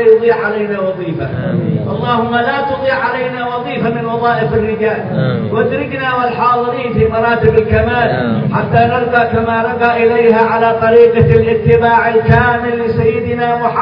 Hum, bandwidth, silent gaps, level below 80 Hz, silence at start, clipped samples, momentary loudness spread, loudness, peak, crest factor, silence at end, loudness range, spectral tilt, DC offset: none; 5.4 kHz; none; -38 dBFS; 0 s; 0.3%; 7 LU; -12 LUFS; 0 dBFS; 12 dB; 0 s; 5 LU; -10 dB/octave; under 0.1%